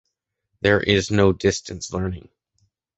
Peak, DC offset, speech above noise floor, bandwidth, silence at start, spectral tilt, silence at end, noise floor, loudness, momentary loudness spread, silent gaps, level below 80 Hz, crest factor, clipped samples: -2 dBFS; under 0.1%; 56 dB; 8.2 kHz; 0.65 s; -5 dB/octave; 0.8 s; -76 dBFS; -21 LUFS; 12 LU; none; -42 dBFS; 20 dB; under 0.1%